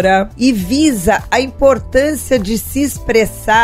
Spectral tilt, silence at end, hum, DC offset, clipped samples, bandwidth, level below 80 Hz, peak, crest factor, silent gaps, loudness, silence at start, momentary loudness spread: -4.5 dB/octave; 0 s; none; under 0.1%; under 0.1%; 16 kHz; -30 dBFS; 0 dBFS; 12 dB; none; -14 LUFS; 0 s; 4 LU